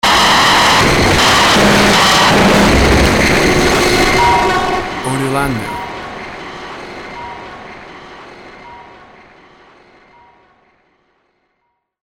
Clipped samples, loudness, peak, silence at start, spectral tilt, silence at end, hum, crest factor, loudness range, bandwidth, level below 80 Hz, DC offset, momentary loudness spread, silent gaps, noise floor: under 0.1%; -10 LUFS; 0 dBFS; 0.05 s; -3.5 dB/octave; 3.25 s; none; 12 dB; 22 LU; 19 kHz; -26 dBFS; under 0.1%; 20 LU; none; -67 dBFS